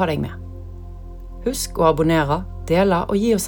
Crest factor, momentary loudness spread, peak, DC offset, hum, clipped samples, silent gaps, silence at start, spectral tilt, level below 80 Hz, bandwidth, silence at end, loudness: 18 dB; 20 LU; -4 dBFS; under 0.1%; none; under 0.1%; none; 0 s; -5.5 dB/octave; -34 dBFS; over 20 kHz; 0 s; -20 LUFS